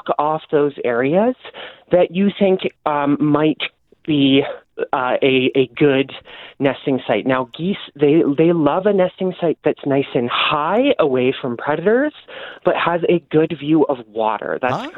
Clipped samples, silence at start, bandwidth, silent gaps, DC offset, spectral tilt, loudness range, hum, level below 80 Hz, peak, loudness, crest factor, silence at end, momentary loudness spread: under 0.1%; 0.05 s; 5.2 kHz; none; under 0.1%; -8.5 dB/octave; 1 LU; none; -60 dBFS; -2 dBFS; -18 LUFS; 14 dB; 0 s; 9 LU